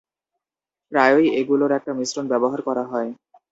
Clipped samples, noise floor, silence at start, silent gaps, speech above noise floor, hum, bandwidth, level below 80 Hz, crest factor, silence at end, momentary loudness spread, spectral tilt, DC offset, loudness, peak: under 0.1%; -89 dBFS; 0.9 s; none; 69 dB; none; 8 kHz; -70 dBFS; 20 dB; 0.35 s; 10 LU; -4.5 dB/octave; under 0.1%; -20 LUFS; -2 dBFS